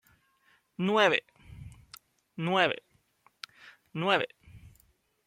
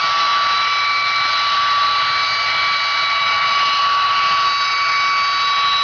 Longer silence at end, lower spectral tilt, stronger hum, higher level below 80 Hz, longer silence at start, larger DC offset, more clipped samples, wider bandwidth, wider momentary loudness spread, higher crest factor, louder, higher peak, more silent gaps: first, 0.7 s vs 0 s; first, -5 dB/octave vs 0.5 dB/octave; neither; second, -64 dBFS vs -56 dBFS; first, 0.8 s vs 0 s; neither; neither; first, 16.5 kHz vs 5.4 kHz; first, 25 LU vs 1 LU; first, 24 dB vs 8 dB; second, -28 LUFS vs -15 LUFS; about the same, -8 dBFS vs -10 dBFS; neither